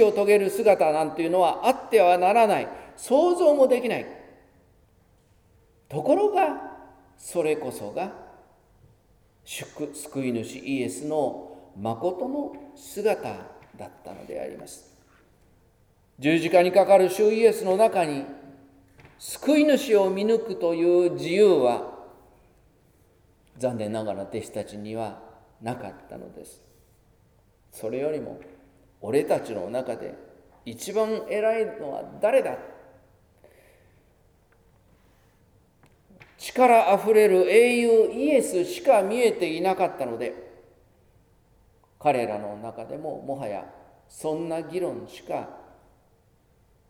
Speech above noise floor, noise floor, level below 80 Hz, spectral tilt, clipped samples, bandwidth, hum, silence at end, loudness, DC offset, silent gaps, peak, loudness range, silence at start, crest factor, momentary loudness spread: 38 dB; -62 dBFS; -64 dBFS; -5 dB/octave; under 0.1%; 17 kHz; none; 1.3 s; -23 LUFS; under 0.1%; none; -4 dBFS; 13 LU; 0 s; 20 dB; 20 LU